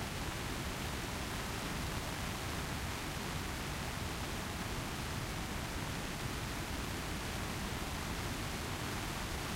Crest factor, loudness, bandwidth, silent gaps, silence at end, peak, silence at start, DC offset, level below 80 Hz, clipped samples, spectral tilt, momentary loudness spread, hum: 14 dB; -40 LUFS; 16 kHz; none; 0 s; -24 dBFS; 0 s; under 0.1%; -48 dBFS; under 0.1%; -4 dB/octave; 1 LU; none